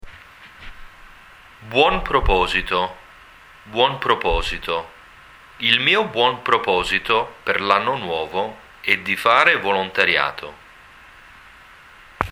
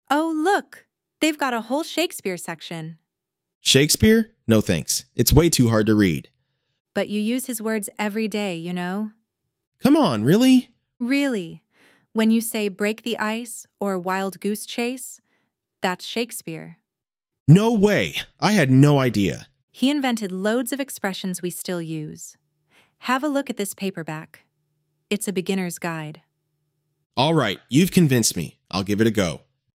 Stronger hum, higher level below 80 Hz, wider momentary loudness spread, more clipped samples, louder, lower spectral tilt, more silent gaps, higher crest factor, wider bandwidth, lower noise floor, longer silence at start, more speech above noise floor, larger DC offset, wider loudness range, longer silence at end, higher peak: neither; first, -36 dBFS vs -44 dBFS; about the same, 13 LU vs 15 LU; neither; about the same, -19 LUFS vs -21 LUFS; about the same, -4 dB/octave vs -5 dB/octave; second, none vs 3.55-3.61 s, 6.80-6.85 s, 9.67-9.72 s, 17.40-17.46 s, 19.63-19.68 s, 27.06-27.10 s; about the same, 22 dB vs 20 dB; first, 18.5 kHz vs 16.5 kHz; second, -46 dBFS vs -87 dBFS; about the same, 0.05 s vs 0.1 s; second, 26 dB vs 66 dB; neither; second, 3 LU vs 9 LU; second, 0 s vs 0.4 s; about the same, 0 dBFS vs -2 dBFS